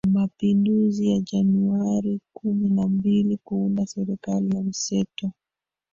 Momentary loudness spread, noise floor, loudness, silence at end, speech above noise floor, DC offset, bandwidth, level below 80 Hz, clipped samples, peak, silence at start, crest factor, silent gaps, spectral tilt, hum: 8 LU; -89 dBFS; -23 LUFS; 0.65 s; 67 dB; under 0.1%; 7.6 kHz; -58 dBFS; under 0.1%; -12 dBFS; 0.05 s; 12 dB; none; -7 dB/octave; none